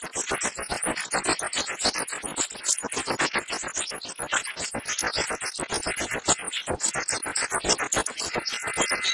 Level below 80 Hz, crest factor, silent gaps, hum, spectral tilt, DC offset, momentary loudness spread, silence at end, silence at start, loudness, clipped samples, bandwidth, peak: -52 dBFS; 22 dB; none; none; -1 dB/octave; under 0.1%; 5 LU; 0 s; 0 s; -26 LUFS; under 0.1%; 11.5 kHz; -6 dBFS